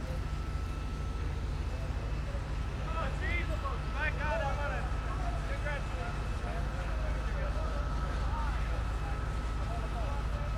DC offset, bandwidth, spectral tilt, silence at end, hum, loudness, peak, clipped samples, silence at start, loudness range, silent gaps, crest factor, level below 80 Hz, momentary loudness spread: under 0.1%; 11 kHz; -6 dB/octave; 0 s; none; -36 LUFS; -20 dBFS; under 0.1%; 0 s; 2 LU; none; 14 dB; -36 dBFS; 4 LU